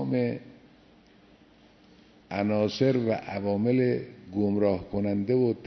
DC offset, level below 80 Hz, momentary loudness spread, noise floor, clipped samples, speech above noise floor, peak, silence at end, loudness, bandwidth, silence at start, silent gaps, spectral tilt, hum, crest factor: under 0.1%; -60 dBFS; 8 LU; -57 dBFS; under 0.1%; 31 dB; -12 dBFS; 0 s; -27 LUFS; 6.4 kHz; 0 s; none; -8 dB/octave; none; 16 dB